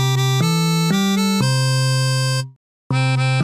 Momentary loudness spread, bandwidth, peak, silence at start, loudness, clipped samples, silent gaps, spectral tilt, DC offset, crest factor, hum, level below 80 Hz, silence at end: 4 LU; 15.5 kHz; -6 dBFS; 0 s; -18 LUFS; under 0.1%; 2.56-2.90 s; -5 dB/octave; 0.2%; 12 dB; none; -58 dBFS; 0 s